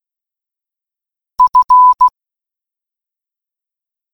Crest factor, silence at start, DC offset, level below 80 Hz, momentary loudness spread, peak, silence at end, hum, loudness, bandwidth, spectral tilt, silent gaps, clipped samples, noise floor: 14 dB; 1.4 s; under 0.1%; -54 dBFS; 7 LU; -2 dBFS; 2.05 s; none; -9 LUFS; 6 kHz; -2 dB/octave; none; under 0.1%; -87 dBFS